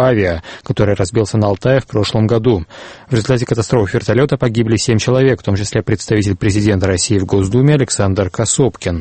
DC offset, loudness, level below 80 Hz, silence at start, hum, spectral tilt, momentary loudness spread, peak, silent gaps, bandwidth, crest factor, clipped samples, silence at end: under 0.1%; -14 LUFS; -38 dBFS; 0 s; none; -5.5 dB/octave; 5 LU; 0 dBFS; none; 8.8 kHz; 14 dB; under 0.1%; 0 s